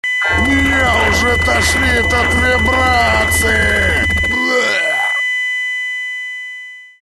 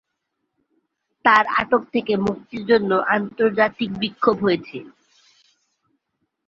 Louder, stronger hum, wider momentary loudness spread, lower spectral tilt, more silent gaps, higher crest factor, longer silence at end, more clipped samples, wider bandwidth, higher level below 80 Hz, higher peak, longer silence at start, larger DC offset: first, -13 LUFS vs -20 LUFS; neither; about the same, 9 LU vs 9 LU; second, -3.5 dB/octave vs -6.5 dB/octave; neither; second, 12 dB vs 20 dB; second, 0.15 s vs 1.6 s; neither; first, 13 kHz vs 7.4 kHz; first, -26 dBFS vs -58 dBFS; about the same, -2 dBFS vs -2 dBFS; second, 0.05 s vs 1.25 s; neither